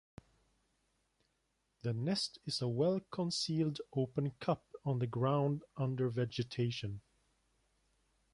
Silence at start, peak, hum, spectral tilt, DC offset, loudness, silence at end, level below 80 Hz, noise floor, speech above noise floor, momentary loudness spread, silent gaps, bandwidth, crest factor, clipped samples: 1.85 s; -20 dBFS; none; -6 dB/octave; under 0.1%; -37 LUFS; 1.35 s; -70 dBFS; -81 dBFS; 45 dB; 6 LU; none; 11.5 kHz; 18 dB; under 0.1%